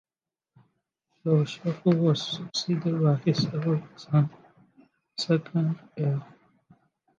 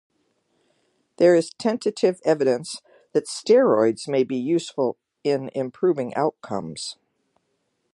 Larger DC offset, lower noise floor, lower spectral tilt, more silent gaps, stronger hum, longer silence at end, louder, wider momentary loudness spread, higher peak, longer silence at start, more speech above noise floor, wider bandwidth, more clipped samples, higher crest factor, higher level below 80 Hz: neither; first, under -90 dBFS vs -73 dBFS; first, -7 dB/octave vs -5.5 dB/octave; neither; neither; about the same, 0.95 s vs 1 s; second, -27 LUFS vs -22 LUFS; second, 7 LU vs 13 LU; second, -10 dBFS vs -6 dBFS; about the same, 1.25 s vs 1.2 s; first, over 65 dB vs 51 dB; second, 7.6 kHz vs 11.5 kHz; neither; about the same, 16 dB vs 18 dB; about the same, -72 dBFS vs -72 dBFS